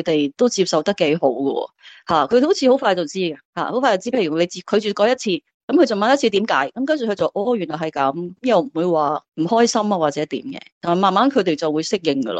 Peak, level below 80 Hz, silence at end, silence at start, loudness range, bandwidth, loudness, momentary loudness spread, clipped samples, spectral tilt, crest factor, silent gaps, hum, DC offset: -2 dBFS; -64 dBFS; 0 s; 0 s; 1 LU; 9 kHz; -19 LUFS; 9 LU; under 0.1%; -4.5 dB/octave; 16 dB; 3.45-3.53 s, 5.54-5.68 s, 9.28-9.32 s, 10.72-10.81 s; none; under 0.1%